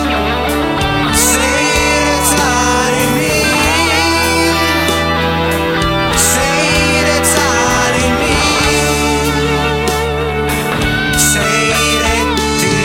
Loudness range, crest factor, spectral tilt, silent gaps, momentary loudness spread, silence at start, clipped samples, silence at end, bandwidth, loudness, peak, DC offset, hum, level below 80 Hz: 2 LU; 12 dB; -3 dB/octave; none; 4 LU; 0 s; under 0.1%; 0 s; 17 kHz; -12 LUFS; 0 dBFS; under 0.1%; none; -26 dBFS